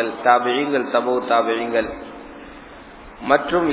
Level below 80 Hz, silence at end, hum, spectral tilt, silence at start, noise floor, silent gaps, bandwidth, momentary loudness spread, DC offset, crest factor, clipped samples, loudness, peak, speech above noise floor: -50 dBFS; 0 s; none; -8.5 dB/octave; 0 s; -40 dBFS; none; 4 kHz; 23 LU; under 0.1%; 20 dB; under 0.1%; -19 LUFS; 0 dBFS; 21 dB